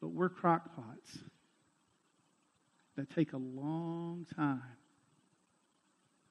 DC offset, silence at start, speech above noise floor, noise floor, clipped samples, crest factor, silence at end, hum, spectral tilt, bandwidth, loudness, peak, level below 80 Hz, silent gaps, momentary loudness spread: under 0.1%; 0 s; 39 dB; -76 dBFS; under 0.1%; 24 dB; 1.55 s; none; -8 dB/octave; 11 kHz; -37 LUFS; -16 dBFS; -84 dBFS; none; 19 LU